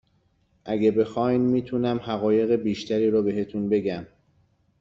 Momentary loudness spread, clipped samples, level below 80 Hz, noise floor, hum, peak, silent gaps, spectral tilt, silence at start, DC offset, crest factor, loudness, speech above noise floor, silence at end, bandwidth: 7 LU; under 0.1%; -60 dBFS; -66 dBFS; none; -10 dBFS; none; -8 dB/octave; 0.65 s; under 0.1%; 16 dB; -24 LUFS; 43 dB; 0.75 s; 7.6 kHz